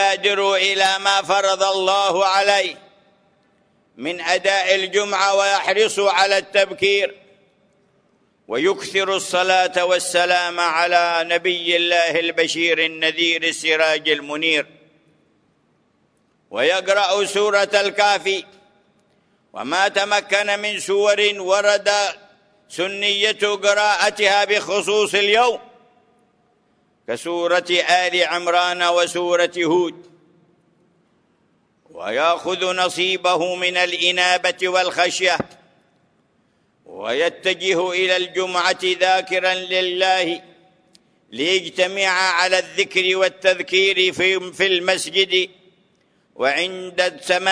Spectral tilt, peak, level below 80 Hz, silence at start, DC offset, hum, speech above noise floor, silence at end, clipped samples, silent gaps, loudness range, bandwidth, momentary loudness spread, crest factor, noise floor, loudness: -1.5 dB/octave; -2 dBFS; -70 dBFS; 0 s; under 0.1%; none; 44 dB; 0 s; under 0.1%; none; 4 LU; 11 kHz; 6 LU; 18 dB; -63 dBFS; -18 LUFS